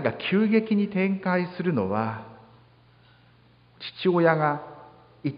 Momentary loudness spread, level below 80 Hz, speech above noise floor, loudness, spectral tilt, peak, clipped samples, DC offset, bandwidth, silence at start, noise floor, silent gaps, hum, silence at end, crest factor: 16 LU; -64 dBFS; 33 dB; -25 LUFS; -11 dB/octave; -6 dBFS; under 0.1%; under 0.1%; 5.2 kHz; 0 s; -57 dBFS; none; none; 0 s; 20 dB